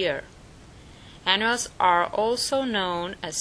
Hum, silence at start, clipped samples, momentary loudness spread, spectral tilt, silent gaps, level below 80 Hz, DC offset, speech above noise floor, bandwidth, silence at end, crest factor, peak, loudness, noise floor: none; 0 s; under 0.1%; 9 LU; -2.5 dB/octave; none; -54 dBFS; under 0.1%; 23 dB; 11 kHz; 0 s; 22 dB; -4 dBFS; -24 LUFS; -47 dBFS